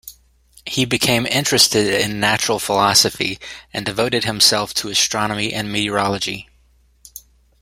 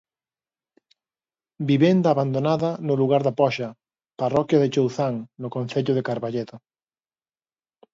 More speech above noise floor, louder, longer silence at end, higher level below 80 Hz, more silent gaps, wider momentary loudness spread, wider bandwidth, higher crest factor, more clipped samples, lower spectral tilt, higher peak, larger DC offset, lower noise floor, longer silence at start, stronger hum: second, 37 dB vs over 68 dB; first, -17 LUFS vs -22 LUFS; second, 0.4 s vs 1.35 s; first, -50 dBFS vs -66 dBFS; neither; about the same, 12 LU vs 12 LU; first, 16.5 kHz vs 7.6 kHz; about the same, 20 dB vs 20 dB; neither; second, -2.5 dB/octave vs -7.5 dB/octave; first, 0 dBFS vs -4 dBFS; neither; second, -55 dBFS vs under -90 dBFS; second, 0.05 s vs 1.6 s; neither